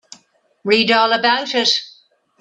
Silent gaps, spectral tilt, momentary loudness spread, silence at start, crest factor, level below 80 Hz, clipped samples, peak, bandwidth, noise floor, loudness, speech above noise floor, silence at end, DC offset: none; -2.5 dB/octave; 6 LU; 0.65 s; 18 dB; -66 dBFS; under 0.1%; 0 dBFS; 9.6 kHz; -55 dBFS; -15 LUFS; 39 dB; 0.5 s; under 0.1%